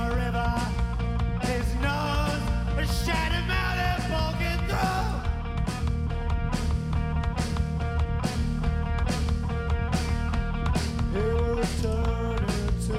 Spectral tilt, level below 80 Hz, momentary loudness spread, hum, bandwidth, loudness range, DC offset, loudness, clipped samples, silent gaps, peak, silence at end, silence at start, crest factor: -6 dB/octave; -30 dBFS; 3 LU; none; 15 kHz; 2 LU; under 0.1%; -28 LUFS; under 0.1%; none; -10 dBFS; 0 s; 0 s; 16 dB